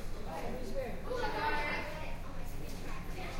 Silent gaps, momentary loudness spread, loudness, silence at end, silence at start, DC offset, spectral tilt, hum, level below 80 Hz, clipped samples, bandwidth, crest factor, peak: none; 11 LU; -39 LUFS; 0 s; 0 s; under 0.1%; -5 dB/octave; none; -40 dBFS; under 0.1%; 16 kHz; 14 dB; -22 dBFS